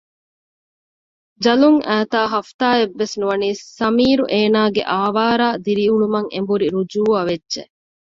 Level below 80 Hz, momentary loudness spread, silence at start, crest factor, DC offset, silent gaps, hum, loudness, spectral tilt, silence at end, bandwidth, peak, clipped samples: -56 dBFS; 7 LU; 1.4 s; 16 dB; under 0.1%; 2.54-2.59 s; none; -17 LUFS; -5.5 dB/octave; 0.55 s; 7.6 kHz; -2 dBFS; under 0.1%